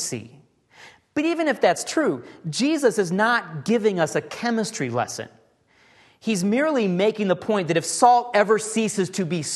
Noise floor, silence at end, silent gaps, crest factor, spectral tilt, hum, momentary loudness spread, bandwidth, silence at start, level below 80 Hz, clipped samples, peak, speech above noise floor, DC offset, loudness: -59 dBFS; 0 s; none; 20 dB; -4.5 dB/octave; none; 11 LU; 12.5 kHz; 0 s; -70 dBFS; under 0.1%; -2 dBFS; 37 dB; under 0.1%; -22 LUFS